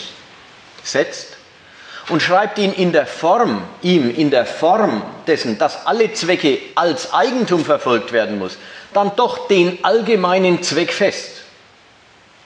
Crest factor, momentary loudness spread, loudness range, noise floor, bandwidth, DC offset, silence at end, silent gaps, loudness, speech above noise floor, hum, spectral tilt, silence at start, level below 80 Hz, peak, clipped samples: 16 dB; 12 LU; 2 LU; -48 dBFS; 10 kHz; under 0.1%; 1 s; none; -16 LUFS; 32 dB; none; -4.5 dB/octave; 0 s; -66 dBFS; -2 dBFS; under 0.1%